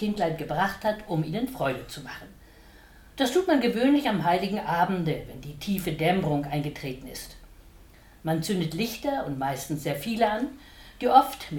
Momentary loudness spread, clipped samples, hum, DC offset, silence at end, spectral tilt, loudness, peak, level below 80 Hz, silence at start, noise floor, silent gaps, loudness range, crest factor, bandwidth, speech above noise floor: 16 LU; under 0.1%; none; under 0.1%; 0 s; -5.5 dB/octave; -27 LUFS; -4 dBFS; -52 dBFS; 0 s; -52 dBFS; none; 5 LU; 22 dB; 19 kHz; 25 dB